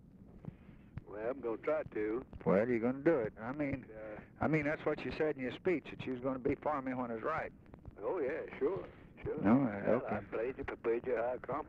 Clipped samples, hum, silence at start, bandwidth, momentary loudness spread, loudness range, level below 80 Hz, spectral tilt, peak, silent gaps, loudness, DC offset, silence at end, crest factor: under 0.1%; none; 0.15 s; 7.2 kHz; 16 LU; 3 LU; -60 dBFS; -9 dB/octave; -18 dBFS; none; -37 LUFS; under 0.1%; 0 s; 20 dB